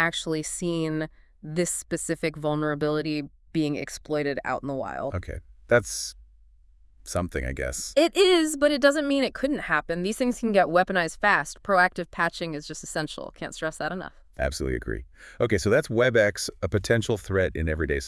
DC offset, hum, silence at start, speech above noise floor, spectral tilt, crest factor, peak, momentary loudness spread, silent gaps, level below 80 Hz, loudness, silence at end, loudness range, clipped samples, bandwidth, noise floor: under 0.1%; none; 0 s; 30 dB; -4.5 dB/octave; 20 dB; -6 dBFS; 12 LU; none; -44 dBFS; -26 LUFS; 0 s; 7 LU; under 0.1%; 12 kHz; -55 dBFS